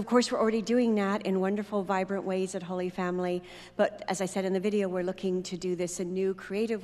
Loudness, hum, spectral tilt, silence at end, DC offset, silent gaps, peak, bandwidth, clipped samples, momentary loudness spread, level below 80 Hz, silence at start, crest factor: -30 LUFS; none; -5.5 dB/octave; 0 s; under 0.1%; none; -10 dBFS; 13 kHz; under 0.1%; 7 LU; -64 dBFS; 0 s; 20 dB